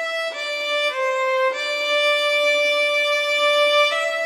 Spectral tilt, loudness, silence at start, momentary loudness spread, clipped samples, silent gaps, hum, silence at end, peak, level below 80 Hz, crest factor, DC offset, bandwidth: 3.5 dB/octave; -18 LUFS; 0 s; 6 LU; under 0.1%; none; none; 0 s; -8 dBFS; under -90 dBFS; 12 dB; under 0.1%; 15 kHz